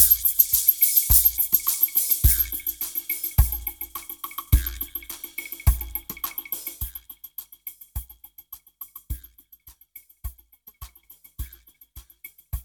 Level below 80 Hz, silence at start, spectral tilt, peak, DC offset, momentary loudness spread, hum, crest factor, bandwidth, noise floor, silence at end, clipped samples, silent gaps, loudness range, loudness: -32 dBFS; 0 s; -2 dB/octave; 0 dBFS; under 0.1%; 24 LU; none; 24 dB; over 20 kHz; -53 dBFS; 0 s; under 0.1%; none; 23 LU; -21 LUFS